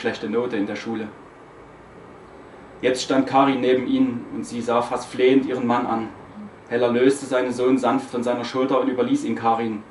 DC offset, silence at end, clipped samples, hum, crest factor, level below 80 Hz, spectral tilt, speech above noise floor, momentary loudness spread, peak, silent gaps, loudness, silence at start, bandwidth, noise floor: under 0.1%; 0 s; under 0.1%; none; 18 dB; -60 dBFS; -5.5 dB/octave; 23 dB; 11 LU; -4 dBFS; none; -22 LUFS; 0 s; 11.5 kHz; -44 dBFS